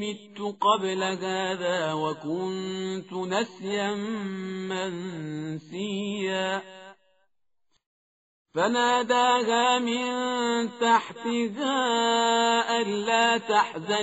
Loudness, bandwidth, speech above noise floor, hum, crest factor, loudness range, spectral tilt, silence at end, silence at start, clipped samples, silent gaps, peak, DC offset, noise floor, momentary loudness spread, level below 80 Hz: -26 LUFS; 8 kHz; 55 dB; none; 18 dB; 8 LU; -2 dB/octave; 0 s; 0 s; under 0.1%; 7.86-8.45 s; -8 dBFS; under 0.1%; -81 dBFS; 12 LU; -74 dBFS